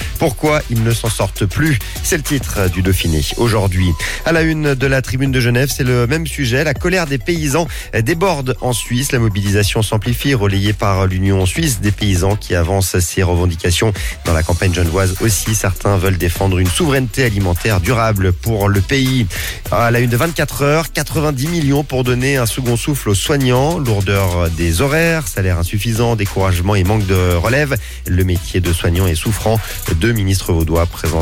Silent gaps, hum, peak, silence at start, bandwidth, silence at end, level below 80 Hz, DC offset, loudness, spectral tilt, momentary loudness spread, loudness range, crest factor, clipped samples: none; none; -4 dBFS; 0 s; 17 kHz; 0 s; -26 dBFS; under 0.1%; -15 LUFS; -5 dB/octave; 3 LU; 1 LU; 12 dB; under 0.1%